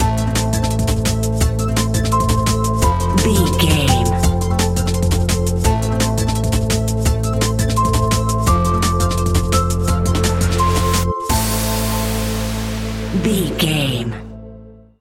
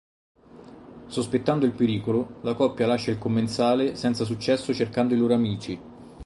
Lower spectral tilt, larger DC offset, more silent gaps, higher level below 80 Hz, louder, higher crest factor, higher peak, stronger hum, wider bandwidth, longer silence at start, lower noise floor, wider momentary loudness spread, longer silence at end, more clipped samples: second, -5 dB/octave vs -6.5 dB/octave; neither; neither; first, -24 dBFS vs -56 dBFS; first, -17 LUFS vs -25 LUFS; about the same, 16 dB vs 18 dB; first, 0 dBFS vs -8 dBFS; neither; first, 17 kHz vs 11.5 kHz; second, 0 s vs 0.55 s; second, -39 dBFS vs -47 dBFS; second, 5 LU vs 8 LU; first, 0.25 s vs 0 s; neither